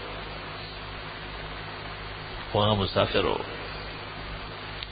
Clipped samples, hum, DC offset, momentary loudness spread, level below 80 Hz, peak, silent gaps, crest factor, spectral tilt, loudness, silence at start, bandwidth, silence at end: under 0.1%; 50 Hz at -45 dBFS; under 0.1%; 13 LU; -44 dBFS; -8 dBFS; none; 24 dB; -9.5 dB/octave; -31 LUFS; 0 s; 5 kHz; 0 s